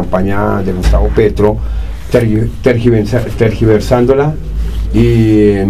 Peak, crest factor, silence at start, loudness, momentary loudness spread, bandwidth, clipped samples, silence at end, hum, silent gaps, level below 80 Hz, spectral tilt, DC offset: 0 dBFS; 10 dB; 0 s; -12 LUFS; 9 LU; 13.5 kHz; 0.3%; 0 s; none; none; -18 dBFS; -8 dB/octave; 4%